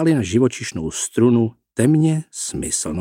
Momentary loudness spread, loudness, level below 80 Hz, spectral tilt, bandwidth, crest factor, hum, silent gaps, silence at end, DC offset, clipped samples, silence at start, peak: 9 LU; -19 LUFS; -46 dBFS; -5.5 dB/octave; 16 kHz; 16 dB; none; none; 0 s; under 0.1%; under 0.1%; 0 s; -4 dBFS